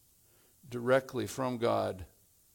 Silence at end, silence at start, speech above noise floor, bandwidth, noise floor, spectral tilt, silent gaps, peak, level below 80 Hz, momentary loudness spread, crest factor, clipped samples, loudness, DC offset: 0.5 s; 0.65 s; 33 dB; 18.5 kHz; -65 dBFS; -5.5 dB/octave; none; -14 dBFS; -66 dBFS; 16 LU; 20 dB; under 0.1%; -32 LUFS; under 0.1%